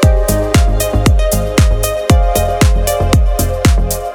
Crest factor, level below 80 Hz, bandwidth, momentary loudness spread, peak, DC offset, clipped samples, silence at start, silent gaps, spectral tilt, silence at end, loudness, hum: 10 dB; -14 dBFS; 19 kHz; 2 LU; 0 dBFS; under 0.1%; under 0.1%; 0 s; none; -5.5 dB/octave; 0 s; -13 LUFS; none